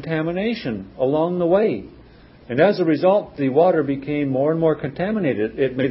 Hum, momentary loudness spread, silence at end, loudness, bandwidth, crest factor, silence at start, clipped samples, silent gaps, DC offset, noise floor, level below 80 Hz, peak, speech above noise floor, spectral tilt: none; 7 LU; 0 s; -20 LUFS; 5.8 kHz; 16 dB; 0 s; under 0.1%; none; under 0.1%; -46 dBFS; -52 dBFS; -4 dBFS; 27 dB; -12 dB/octave